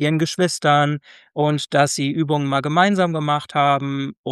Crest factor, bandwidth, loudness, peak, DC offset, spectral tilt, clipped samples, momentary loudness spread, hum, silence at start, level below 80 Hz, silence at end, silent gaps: 18 dB; 12.5 kHz; -19 LUFS; -2 dBFS; under 0.1%; -5 dB/octave; under 0.1%; 6 LU; none; 0 s; -64 dBFS; 0 s; 4.17-4.24 s